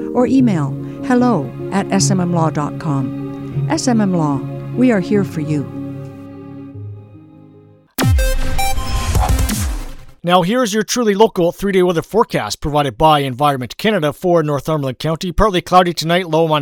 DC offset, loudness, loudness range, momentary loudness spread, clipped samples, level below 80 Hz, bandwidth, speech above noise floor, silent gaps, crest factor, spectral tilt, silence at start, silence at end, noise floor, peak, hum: under 0.1%; -16 LUFS; 6 LU; 14 LU; under 0.1%; -26 dBFS; 19 kHz; 30 dB; none; 16 dB; -5.5 dB/octave; 0 s; 0 s; -45 dBFS; 0 dBFS; none